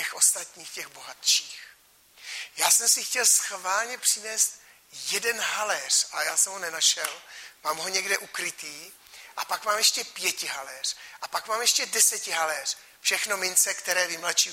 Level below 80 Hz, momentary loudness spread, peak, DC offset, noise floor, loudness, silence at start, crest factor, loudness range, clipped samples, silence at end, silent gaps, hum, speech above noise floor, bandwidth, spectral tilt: -78 dBFS; 17 LU; -6 dBFS; under 0.1%; -48 dBFS; -24 LUFS; 0 s; 22 dB; 4 LU; under 0.1%; 0 s; none; none; 21 dB; 16.5 kHz; 2.5 dB/octave